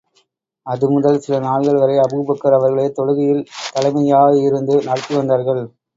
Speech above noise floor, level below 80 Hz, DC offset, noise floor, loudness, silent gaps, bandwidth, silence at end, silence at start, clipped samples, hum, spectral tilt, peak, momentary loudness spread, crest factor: 47 dB; -60 dBFS; under 0.1%; -62 dBFS; -16 LUFS; none; 7.8 kHz; 0.3 s; 0.65 s; under 0.1%; none; -7 dB/octave; 0 dBFS; 8 LU; 16 dB